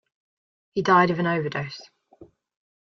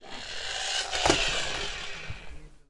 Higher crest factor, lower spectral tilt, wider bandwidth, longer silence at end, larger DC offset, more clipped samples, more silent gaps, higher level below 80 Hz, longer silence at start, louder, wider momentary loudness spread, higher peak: about the same, 20 dB vs 24 dB; first, -6.5 dB/octave vs -2 dB/octave; second, 7.4 kHz vs 11.5 kHz; first, 0.65 s vs 0.15 s; neither; neither; neither; second, -64 dBFS vs -44 dBFS; first, 0.75 s vs 0 s; first, -22 LUFS vs -28 LUFS; about the same, 16 LU vs 17 LU; about the same, -6 dBFS vs -6 dBFS